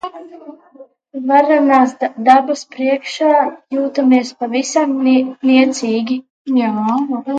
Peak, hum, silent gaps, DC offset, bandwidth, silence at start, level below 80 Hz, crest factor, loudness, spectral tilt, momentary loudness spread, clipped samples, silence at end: 0 dBFS; none; 6.30-6.45 s; under 0.1%; 9 kHz; 0.05 s; -70 dBFS; 14 dB; -15 LUFS; -4 dB/octave; 10 LU; under 0.1%; 0 s